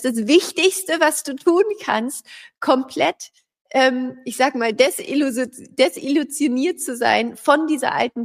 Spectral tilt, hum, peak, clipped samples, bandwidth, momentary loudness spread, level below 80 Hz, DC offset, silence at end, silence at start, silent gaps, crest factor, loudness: -2.5 dB/octave; none; -2 dBFS; under 0.1%; 15.5 kHz; 9 LU; -70 dBFS; under 0.1%; 0 s; 0 s; 3.61-3.65 s; 18 dB; -19 LUFS